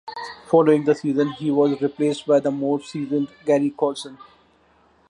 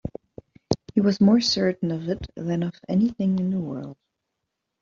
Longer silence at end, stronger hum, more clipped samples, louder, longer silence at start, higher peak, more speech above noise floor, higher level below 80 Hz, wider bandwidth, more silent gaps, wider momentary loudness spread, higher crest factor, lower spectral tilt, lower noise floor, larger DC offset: about the same, 0.85 s vs 0.9 s; neither; neither; about the same, -21 LUFS vs -23 LUFS; about the same, 0.05 s vs 0.05 s; about the same, -4 dBFS vs -4 dBFS; second, 38 dB vs 58 dB; second, -66 dBFS vs -52 dBFS; first, 11 kHz vs 7.4 kHz; neither; second, 8 LU vs 16 LU; about the same, 18 dB vs 20 dB; about the same, -6.5 dB/octave vs -6 dB/octave; second, -58 dBFS vs -81 dBFS; neither